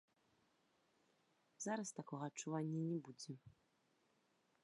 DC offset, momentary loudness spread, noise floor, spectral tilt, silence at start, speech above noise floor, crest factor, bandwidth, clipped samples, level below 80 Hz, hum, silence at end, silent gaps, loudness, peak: under 0.1%; 11 LU; -81 dBFS; -5.5 dB/octave; 1.6 s; 35 dB; 20 dB; 11 kHz; under 0.1%; under -90 dBFS; none; 1.15 s; none; -47 LUFS; -30 dBFS